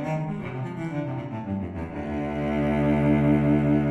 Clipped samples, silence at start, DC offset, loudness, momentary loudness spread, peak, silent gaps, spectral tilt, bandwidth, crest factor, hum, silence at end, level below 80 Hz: under 0.1%; 0 s; under 0.1%; -25 LUFS; 11 LU; -10 dBFS; none; -9.5 dB/octave; 8 kHz; 14 dB; none; 0 s; -42 dBFS